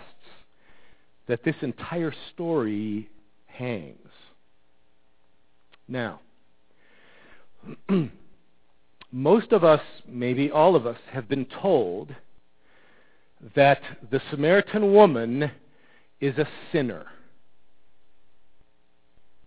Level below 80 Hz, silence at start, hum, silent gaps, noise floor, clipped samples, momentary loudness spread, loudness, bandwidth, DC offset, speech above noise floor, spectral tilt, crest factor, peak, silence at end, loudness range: -64 dBFS; 1.3 s; none; none; -69 dBFS; under 0.1%; 17 LU; -24 LUFS; 4 kHz; 0.3%; 46 dB; -10.5 dB/octave; 24 dB; -2 dBFS; 2.35 s; 16 LU